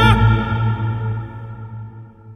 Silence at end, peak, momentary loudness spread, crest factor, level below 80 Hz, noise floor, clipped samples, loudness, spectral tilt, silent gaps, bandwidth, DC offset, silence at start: 0 s; 0 dBFS; 20 LU; 18 dB; -28 dBFS; -37 dBFS; under 0.1%; -18 LUFS; -7.5 dB/octave; none; 10 kHz; under 0.1%; 0 s